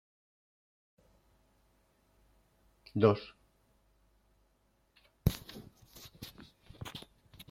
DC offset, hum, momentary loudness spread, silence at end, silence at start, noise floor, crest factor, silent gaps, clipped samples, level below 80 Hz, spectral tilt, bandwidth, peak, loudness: under 0.1%; none; 27 LU; 0.5 s; 2.95 s; -73 dBFS; 28 dB; none; under 0.1%; -56 dBFS; -7 dB/octave; 16.5 kHz; -12 dBFS; -34 LUFS